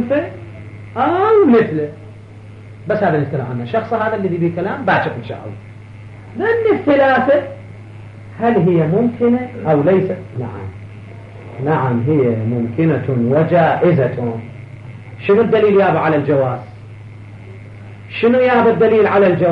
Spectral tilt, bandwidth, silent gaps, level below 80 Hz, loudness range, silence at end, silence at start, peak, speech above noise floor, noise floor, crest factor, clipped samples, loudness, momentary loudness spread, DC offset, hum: -9.5 dB/octave; 5.8 kHz; none; -52 dBFS; 4 LU; 0 s; 0 s; -4 dBFS; 21 dB; -36 dBFS; 12 dB; under 0.1%; -15 LUFS; 23 LU; under 0.1%; none